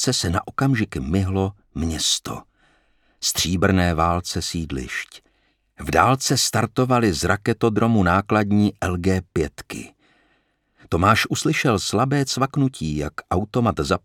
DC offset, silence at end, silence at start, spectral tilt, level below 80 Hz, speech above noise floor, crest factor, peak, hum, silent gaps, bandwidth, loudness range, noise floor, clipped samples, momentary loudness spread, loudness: under 0.1%; 0.05 s; 0 s; -4.5 dB/octave; -40 dBFS; 45 dB; 20 dB; 0 dBFS; none; none; 18 kHz; 4 LU; -65 dBFS; under 0.1%; 10 LU; -21 LUFS